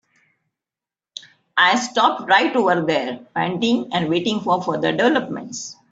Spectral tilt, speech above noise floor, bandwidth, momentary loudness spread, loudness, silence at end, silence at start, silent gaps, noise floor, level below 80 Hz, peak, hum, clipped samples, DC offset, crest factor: -4 dB/octave; 71 dB; 8 kHz; 15 LU; -19 LUFS; 0.2 s; 1.55 s; none; -90 dBFS; -64 dBFS; -2 dBFS; none; under 0.1%; under 0.1%; 18 dB